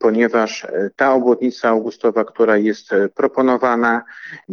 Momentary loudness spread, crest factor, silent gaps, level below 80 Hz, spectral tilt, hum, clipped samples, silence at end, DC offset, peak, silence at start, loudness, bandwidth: 7 LU; 16 dB; none; -66 dBFS; -5.5 dB/octave; none; under 0.1%; 0 s; under 0.1%; -2 dBFS; 0 s; -17 LUFS; 7 kHz